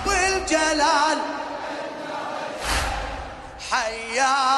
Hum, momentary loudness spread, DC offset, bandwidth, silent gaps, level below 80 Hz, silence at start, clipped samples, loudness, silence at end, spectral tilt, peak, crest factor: none; 12 LU; under 0.1%; 12 kHz; none; -38 dBFS; 0 s; under 0.1%; -23 LUFS; 0 s; -2 dB/octave; -8 dBFS; 16 dB